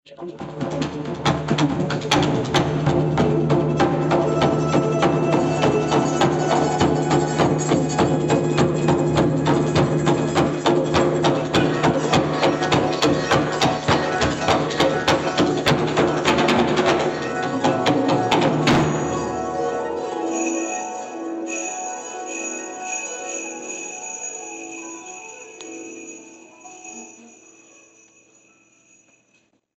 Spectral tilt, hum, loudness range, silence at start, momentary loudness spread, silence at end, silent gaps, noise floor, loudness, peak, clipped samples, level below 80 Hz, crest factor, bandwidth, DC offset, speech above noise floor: -5 dB/octave; none; 12 LU; 0.1 s; 14 LU; 2.5 s; none; -63 dBFS; -20 LUFS; -6 dBFS; under 0.1%; -46 dBFS; 14 dB; 12 kHz; under 0.1%; 36 dB